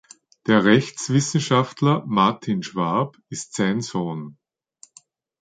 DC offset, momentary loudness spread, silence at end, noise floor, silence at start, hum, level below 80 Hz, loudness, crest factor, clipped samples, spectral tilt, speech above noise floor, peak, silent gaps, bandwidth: under 0.1%; 13 LU; 1.1 s; -54 dBFS; 0.45 s; none; -62 dBFS; -21 LUFS; 20 dB; under 0.1%; -5.5 dB/octave; 34 dB; -2 dBFS; none; 9.4 kHz